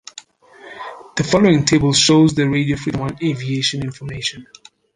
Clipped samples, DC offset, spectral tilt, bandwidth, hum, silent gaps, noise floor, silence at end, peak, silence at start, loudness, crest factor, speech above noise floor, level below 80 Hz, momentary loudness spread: under 0.1%; under 0.1%; -4.5 dB/octave; 11 kHz; none; none; -44 dBFS; 0.5 s; 0 dBFS; 0.65 s; -17 LUFS; 18 dB; 27 dB; -46 dBFS; 16 LU